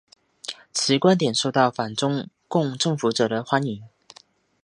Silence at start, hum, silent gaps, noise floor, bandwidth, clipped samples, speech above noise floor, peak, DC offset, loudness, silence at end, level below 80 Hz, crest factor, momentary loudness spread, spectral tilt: 0.45 s; none; none; -55 dBFS; 11.5 kHz; under 0.1%; 33 dB; -2 dBFS; under 0.1%; -22 LUFS; 0.75 s; -68 dBFS; 20 dB; 14 LU; -4.5 dB/octave